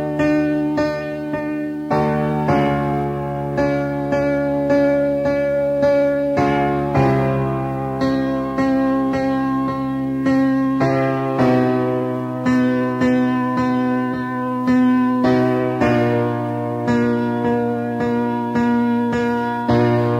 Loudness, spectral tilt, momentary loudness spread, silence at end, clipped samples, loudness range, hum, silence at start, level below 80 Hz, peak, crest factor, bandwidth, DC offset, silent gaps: -19 LUFS; -8 dB/octave; 6 LU; 0 s; under 0.1%; 2 LU; none; 0 s; -44 dBFS; -4 dBFS; 14 dB; 8.4 kHz; under 0.1%; none